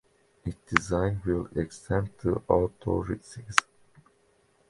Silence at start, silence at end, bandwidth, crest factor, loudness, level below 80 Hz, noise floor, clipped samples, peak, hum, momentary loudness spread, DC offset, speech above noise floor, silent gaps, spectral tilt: 0.45 s; 1.1 s; 11.5 kHz; 30 dB; -29 LUFS; -46 dBFS; -66 dBFS; under 0.1%; 0 dBFS; none; 11 LU; under 0.1%; 38 dB; none; -5.5 dB/octave